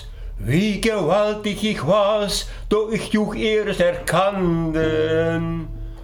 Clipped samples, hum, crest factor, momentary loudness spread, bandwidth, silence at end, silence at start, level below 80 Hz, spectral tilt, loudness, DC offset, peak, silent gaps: under 0.1%; none; 16 dB; 6 LU; 18 kHz; 0 s; 0 s; -36 dBFS; -5.5 dB/octave; -20 LUFS; under 0.1%; -4 dBFS; none